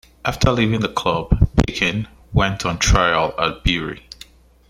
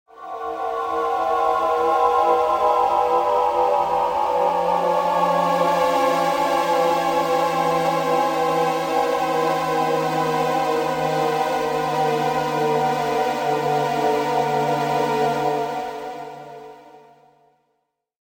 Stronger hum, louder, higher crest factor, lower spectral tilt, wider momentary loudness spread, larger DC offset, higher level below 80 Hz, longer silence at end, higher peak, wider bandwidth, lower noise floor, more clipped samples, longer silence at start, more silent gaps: neither; about the same, -19 LUFS vs -20 LUFS; about the same, 20 dB vs 16 dB; about the same, -5 dB/octave vs -5 dB/octave; first, 12 LU vs 6 LU; neither; first, -26 dBFS vs -56 dBFS; second, 0.7 s vs 1.35 s; first, 0 dBFS vs -6 dBFS; about the same, 15.5 kHz vs 17 kHz; second, -45 dBFS vs -73 dBFS; neither; about the same, 0.25 s vs 0.15 s; neither